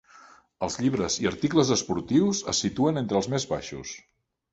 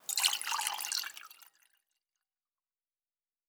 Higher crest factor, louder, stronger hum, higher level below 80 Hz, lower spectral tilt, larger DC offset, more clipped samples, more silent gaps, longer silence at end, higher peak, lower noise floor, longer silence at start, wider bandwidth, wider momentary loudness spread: second, 20 dB vs 28 dB; first, -26 LUFS vs -32 LUFS; neither; first, -54 dBFS vs under -90 dBFS; first, -4.5 dB/octave vs 5 dB/octave; neither; neither; neither; second, 0.55 s vs 2.05 s; first, -6 dBFS vs -12 dBFS; second, -53 dBFS vs under -90 dBFS; first, 0.6 s vs 0.1 s; second, 8.2 kHz vs over 20 kHz; second, 12 LU vs 19 LU